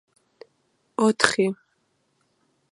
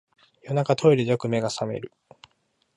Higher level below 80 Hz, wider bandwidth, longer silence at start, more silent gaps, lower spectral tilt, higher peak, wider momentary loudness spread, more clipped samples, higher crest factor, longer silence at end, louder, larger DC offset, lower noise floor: about the same, -66 dBFS vs -64 dBFS; about the same, 11.5 kHz vs 11.5 kHz; first, 1 s vs 0.45 s; neither; second, -3.5 dB/octave vs -6.5 dB/octave; first, 0 dBFS vs -6 dBFS; first, 16 LU vs 13 LU; neither; first, 26 dB vs 20 dB; first, 1.15 s vs 0.9 s; about the same, -22 LUFS vs -23 LUFS; neither; about the same, -70 dBFS vs -70 dBFS